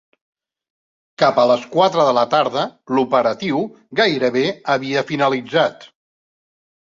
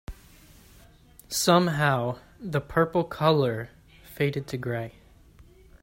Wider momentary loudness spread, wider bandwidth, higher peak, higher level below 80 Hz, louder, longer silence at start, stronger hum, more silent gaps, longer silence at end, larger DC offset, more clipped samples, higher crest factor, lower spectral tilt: second, 7 LU vs 15 LU; second, 7.6 kHz vs 16 kHz; first, -2 dBFS vs -6 dBFS; second, -62 dBFS vs -52 dBFS; first, -18 LUFS vs -26 LUFS; first, 1.2 s vs 0.1 s; neither; neither; first, 0.95 s vs 0.4 s; neither; neither; second, 16 dB vs 22 dB; about the same, -5 dB/octave vs -5 dB/octave